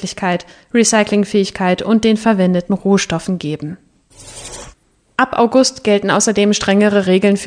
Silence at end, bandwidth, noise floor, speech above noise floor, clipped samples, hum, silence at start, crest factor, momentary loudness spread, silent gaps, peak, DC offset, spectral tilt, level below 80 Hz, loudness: 0 s; 10 kHz; -46 dBFS; 32 dB; under 0.1%; none; 0 s; 14 dB; 15 LU; none; 0 dBFS; under 0.1%; -4.5 dB/octave; -48 dBFS; -14 LUFS